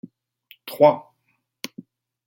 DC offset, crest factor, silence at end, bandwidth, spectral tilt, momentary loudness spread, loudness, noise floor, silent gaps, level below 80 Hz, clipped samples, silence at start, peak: under 0.1%; 22 dB; 1.25 s; 17 kHz; -5.5 dB/octave; 20 LU; -19 LUFS; -71 dBFS; none; -78 dBFS; under 0.1%; 0.65 s; -2 dBFS